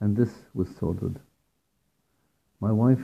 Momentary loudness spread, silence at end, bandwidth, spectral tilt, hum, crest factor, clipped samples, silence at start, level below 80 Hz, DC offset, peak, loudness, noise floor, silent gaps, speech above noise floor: 10 LU; 0 s; 8.6 kHz; -10.5 dB/octave; none; 18 dB; under 0.1%; 0 s; -58 dBFS; under 0.1%; -10 dBFS; -28 LUFS; -74 dBFS; none; 49 dB